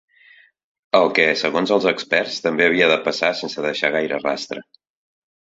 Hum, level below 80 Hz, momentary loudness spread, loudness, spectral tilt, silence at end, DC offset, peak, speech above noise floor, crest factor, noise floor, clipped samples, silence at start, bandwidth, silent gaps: none; -64 dBFS; 9 LU; -18 LUFS; -4 dB/octave; 0.8 s; under 0.1%; -2 dBFS; 33 dB; 20 dB; -52 dBFS; under 0.1%; 0.95 s; 8 kHz; none